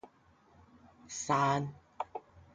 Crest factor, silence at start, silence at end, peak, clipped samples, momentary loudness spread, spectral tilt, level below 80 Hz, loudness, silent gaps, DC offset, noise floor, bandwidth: 20 dB; 0.05 s; 0.15 s; -18 dBFS; under 0.1%; 15 LU; -4.5 dB/octave; -68 dBFS; -34 LUFS; none; under 0.1%; -65 dBFS; 9.6 kHz